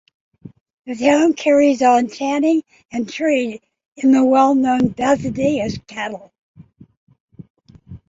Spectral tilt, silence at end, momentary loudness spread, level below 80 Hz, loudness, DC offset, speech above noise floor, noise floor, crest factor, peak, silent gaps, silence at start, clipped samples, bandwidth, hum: -5.5 dB/octave; 0.1 s; 14 LU; -52 dBFS; -17 LUFS; under 0.1%; 24 dB; -40 dBFS; 16 dB; -2 dBFS; 0.61-0.66 s, 0.73-0.85 s, 2.85-2.89 s, 3.88-3.92 s, 6.38-6.54 s, 6.97-7.07 s, 7.20-7.28 s, 7.50-7.54 s; 0.45 s; under 0.1%; 7.8 kHz; none